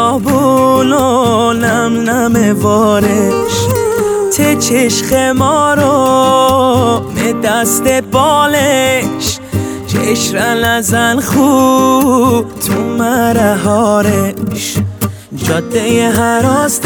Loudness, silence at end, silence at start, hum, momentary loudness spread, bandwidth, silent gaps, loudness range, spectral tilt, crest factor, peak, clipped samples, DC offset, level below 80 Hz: -11 LUFS; 0 s; 0 s; none; 7 LU; over 20 kHz; none; 2 LU; -4.5 dB/octave; 10 dB; 0 dBFS; under 0.1%; under 0.1%; -40 dBFS